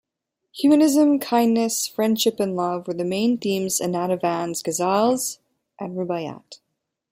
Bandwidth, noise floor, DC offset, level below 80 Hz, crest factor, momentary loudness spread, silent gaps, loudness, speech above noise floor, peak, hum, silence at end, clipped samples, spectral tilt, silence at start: 16 kHz; -81 dBFS; under 0.1%; -68 dBFS; 16 dB; 13 LU; none; -21 LUFS; 60 dB; -6 dBFS; none; 0.55 s; under 0.1%; -4.5 dB/octave; 0.55 s